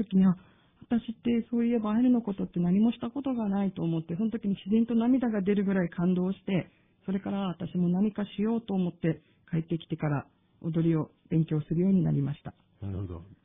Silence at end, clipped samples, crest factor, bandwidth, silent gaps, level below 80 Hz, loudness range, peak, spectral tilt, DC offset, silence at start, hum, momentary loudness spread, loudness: 0.1 s; under 0.1%; 14 dB; 3.8 kHz; none; -58 dBFS; 3 LU; -14 dBFS; -12 dB/octave; under 0.1%; 0 s; none; 10 LU; -29 LUFS